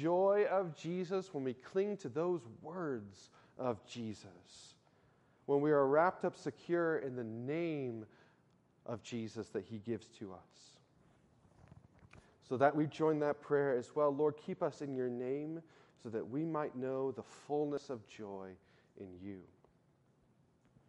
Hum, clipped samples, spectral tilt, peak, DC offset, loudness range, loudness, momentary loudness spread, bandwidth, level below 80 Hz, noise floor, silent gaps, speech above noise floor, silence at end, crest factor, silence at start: none; under 0.1%; -7 dB/octave; -16 dBFS; under 0.1%; 12 LU; -38 LUFS; 19 LU; 9.4 kHz; -80 dBFS; -72 dBFS; none; 34 dB; 1.45 s; 22 dB; 0 s